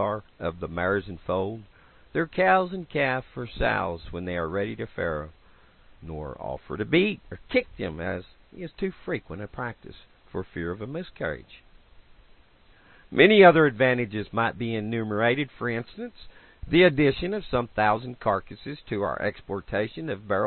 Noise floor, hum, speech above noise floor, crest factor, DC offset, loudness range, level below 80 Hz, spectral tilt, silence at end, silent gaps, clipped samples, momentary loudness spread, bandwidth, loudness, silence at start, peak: -56 dBFS; none; 31 dB; 24 dB; under 0.1%; 13 LU; -48 dBFS; -10.5 dB/octave; 0 s; none; under 0.1%; 18 LU; 4.4 kHz; -25 LUFS; 0 s; -2 dBFS